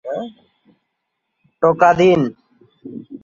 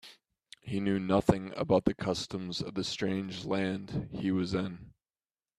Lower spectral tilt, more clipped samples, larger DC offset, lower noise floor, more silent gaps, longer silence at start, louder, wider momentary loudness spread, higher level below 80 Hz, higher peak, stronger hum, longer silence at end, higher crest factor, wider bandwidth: about the same, -7 dB/octave vs -6 dB/octave; neither; neither; second, -75 dBFS vs under -90 dBFS; neither; about the same, 0.05 s vs 0.05 s; first, -15 LUFS vs -32 LUFS; first, 23 LU vs 10 LU; about the same, -56 dBFS vs -56 dBFS; first, -2 dBFS vs -8 dBFS; neither; second, 0.05 s vs 0.7 s; second, 18 dB vs 24 dB; second, 7.4 kHz vs 12.5 kHz